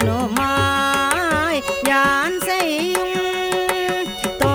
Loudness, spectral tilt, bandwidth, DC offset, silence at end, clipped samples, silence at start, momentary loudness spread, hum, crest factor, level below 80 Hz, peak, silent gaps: -19 LUFS; -4 dB/octave; over 20 kHz; under 0.1%; 0 s; under 0.1%; 0 s; 5 LU; none; 18 dB; -44 dBFS; 0 dBFS; none